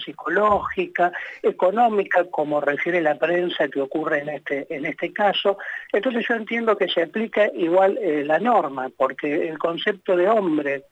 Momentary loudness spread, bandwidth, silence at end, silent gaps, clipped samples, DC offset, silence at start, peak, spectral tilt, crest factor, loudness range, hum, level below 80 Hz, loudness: 7 LU; 8.2 kHz; 0.1 s; none; under 0.1%; under 0.1%; 0 s; -6 dBFS; -6.5 dB/octave; 16 dB; 2 LU; none; -62 dBFS; -22 LUFS